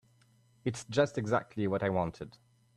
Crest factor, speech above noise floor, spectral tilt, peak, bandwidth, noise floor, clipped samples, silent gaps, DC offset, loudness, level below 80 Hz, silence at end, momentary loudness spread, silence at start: 20 dB; 34 dB; -6 dB/octave; -14 dBFS; 12 kHz; -66 dBFS; under 0.1%; none; under 0.1%; -33 LUFS; -64 dBFS; 0.45 s; 10 LU; 0.65 s